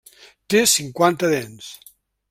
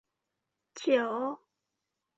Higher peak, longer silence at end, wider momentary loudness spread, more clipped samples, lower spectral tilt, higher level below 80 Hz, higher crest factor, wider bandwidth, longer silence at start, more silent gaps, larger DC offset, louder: first, -2 dBFS vs -12 dBFS; second, 0.55 s vs 0.8 s; about the same, 21 LU vs 19 LU; neither; about the same, -3 dB/octave vs -2 dB/octave; first, -60 dBFS vs -84 dBFS; about the same, 20 dB vs 22 dB; first, 16.5 kHz vs 8 kHz; second, 0.5 s vs 0.75 s; neither; neither; first, -18 LUFS vs -31 LUFS